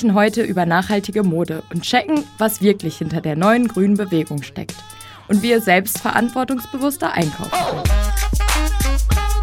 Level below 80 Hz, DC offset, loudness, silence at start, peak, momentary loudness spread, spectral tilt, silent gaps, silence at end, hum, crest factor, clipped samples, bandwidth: -24 dBFS; under 0.1%; -18 LUFS; 0 s; 0 dBFS; 8 LU; -5 dB/octave; none; 0 s; none; 18 dB; under 0.1%; 17.5 kHz